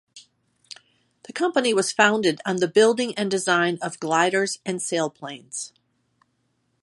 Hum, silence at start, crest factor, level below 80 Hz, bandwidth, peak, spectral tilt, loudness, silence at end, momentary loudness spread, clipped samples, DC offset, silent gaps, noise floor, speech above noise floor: none; 0.15 s; 22 dB; -74 dBFS; 11.5 kHz; -2 dBFS; -3.5 dB/octave; -22 LUFS; 1.15 s; 19 LU; under 0.1%; under 0.1%; none; -71 dBFS; 49 dB